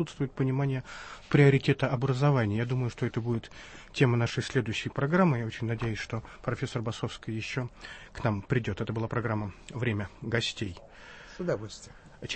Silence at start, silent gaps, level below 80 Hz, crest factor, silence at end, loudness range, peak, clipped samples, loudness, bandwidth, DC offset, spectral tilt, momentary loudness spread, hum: 0 s; none; -54 dBFS; 20 dB; 0 s; 6 LU; -10 dBFS; under 0.1%; -30 LUFS; 8.6 kHz; under 0.1%; -6.5 dB/octave; 18 LU; none